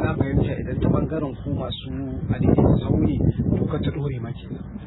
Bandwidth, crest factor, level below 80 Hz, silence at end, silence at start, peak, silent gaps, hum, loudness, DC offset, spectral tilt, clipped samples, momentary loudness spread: 4.1 kHz; 18 dB; -34 dBFS; 0 s; 0 s; -4 dBFS; none; none; -23 LUFS; under 0.1%; -12.5 dB/octave; under 0.1%; 11 LU